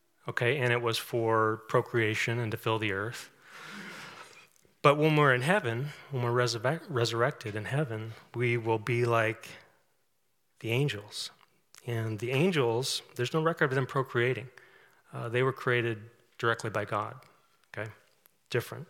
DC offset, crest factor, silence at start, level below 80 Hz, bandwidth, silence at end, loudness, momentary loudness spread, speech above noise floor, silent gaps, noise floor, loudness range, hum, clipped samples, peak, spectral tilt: under 0.1%; 24 dB; 0.25 s; -78 dBFS; 17 kHz; 0.05 s; -30 LUFS; 16 LU; 48 dB; none; -78 dBFS; 5 LU; none; under 0.1%; -6 dBFS; -5.5 dB/octave